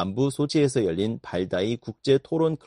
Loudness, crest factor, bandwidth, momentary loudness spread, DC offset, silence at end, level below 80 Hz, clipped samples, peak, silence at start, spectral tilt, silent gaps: -25 LUFS; 16 dB; 11.5 kHz; 7 LU; under 0.1%; 0.1 s; -58 dBFS; under 0.1%; -8 dBFS; 0 s; -6.5 dB/octave; none